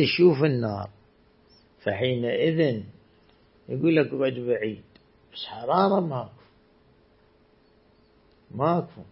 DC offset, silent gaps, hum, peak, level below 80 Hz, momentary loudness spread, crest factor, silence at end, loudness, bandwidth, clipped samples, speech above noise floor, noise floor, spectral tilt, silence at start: under 0.1%; none; none; -6 dBFS; -64 dBFS; 18 LU; 20 dB; 0.1 s; -25 LUFS; 5.8 kHz; under 0.1%; 36 dB; -60 dBFS; -11 dB/octave; 0 s